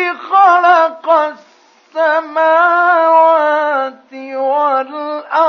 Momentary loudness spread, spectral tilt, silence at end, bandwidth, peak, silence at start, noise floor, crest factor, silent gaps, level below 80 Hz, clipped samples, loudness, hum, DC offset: 13 LU; -2.5 dB/octave; 0 s; 6.4 kHz; 0 dBFS; 0 s; -48 dBFS; 12 dB; none; -84 dBFS; under 0.1%; -12 LUFS; none; under 0.1%